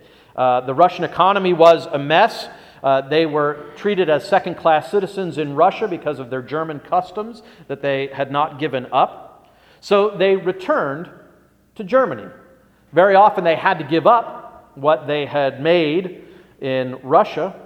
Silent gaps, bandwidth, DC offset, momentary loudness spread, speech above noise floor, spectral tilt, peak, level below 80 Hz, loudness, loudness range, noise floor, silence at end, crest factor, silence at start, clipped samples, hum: none; 12.5 kHz; under 0.1%; 12 LU; 35 dB; -6.5 dB/octave; 0 dBFS; -62 dBFS; -18 LUFS; 6 LU; -53 dBFS; 0 s; 18 dB; 0.35 s; under 0.1%; none